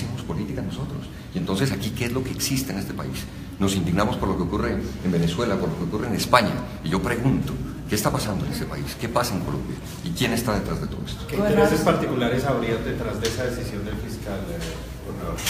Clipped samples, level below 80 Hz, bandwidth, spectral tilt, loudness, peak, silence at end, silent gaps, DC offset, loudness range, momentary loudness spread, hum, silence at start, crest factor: under 0.1%; -38 dBFS; 15.5 kHz; -5.5 dB/octave; -25 LUFS; 0 dBFS; 0 s; none; under 0.1%; 4 LU; 11 LU; none; 0 s; 24 dB